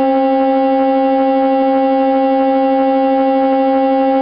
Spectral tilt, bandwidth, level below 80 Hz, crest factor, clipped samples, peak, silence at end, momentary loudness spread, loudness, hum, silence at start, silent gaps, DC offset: -10 dB/octave; 5.2 kHz; -56 dBFS; 8 dB; under 0.1%; -4 dBFS; 0 s; 0 LU; -13 LUFS; none; 0 s; none; under 0.1%